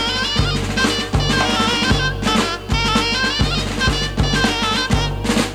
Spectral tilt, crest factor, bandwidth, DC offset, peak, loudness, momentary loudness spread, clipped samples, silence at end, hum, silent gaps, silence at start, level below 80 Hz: -4 dB/octave; 16 dB; 17 kHz; under 0.1%; -2 dBFS; -17 LUFS; 3 LU; under 0.1%; 0 s; none; none; 0 s; -26 dBFS